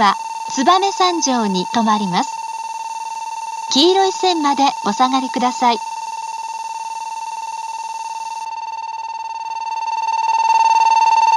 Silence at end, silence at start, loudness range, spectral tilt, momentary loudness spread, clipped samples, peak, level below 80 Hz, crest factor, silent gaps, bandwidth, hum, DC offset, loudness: 0 s; 0 s; 9 LU; -3 dB/octave; 13 LU; under 0.1%; 0 dBFS; -74 dBFS; 16 dB; none; 12 kHz; none; under 0.1%; -18 LUFS